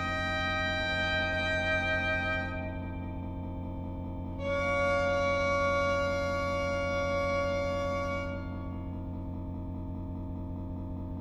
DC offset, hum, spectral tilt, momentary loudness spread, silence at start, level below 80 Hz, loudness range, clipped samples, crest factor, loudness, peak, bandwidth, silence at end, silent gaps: under 0.1%; none; -5.5 dB/octave; 11 LU; 0 s; -44 dBFS; 6 LU; under 0.1%; 14 dB; -32 LUFS; -18 dBFS; 12 kHz; 0 s; none